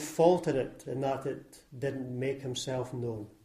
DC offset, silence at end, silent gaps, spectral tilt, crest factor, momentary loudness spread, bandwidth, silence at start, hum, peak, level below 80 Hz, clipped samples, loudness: under 0.1%; 0.15 s; none; -5.5 dB/octave; 22 dB; 13 LU; 15.5 kHz; 0 s; none; -10 dBFS; -62 dBFS; under 0.1%; -32 LUFS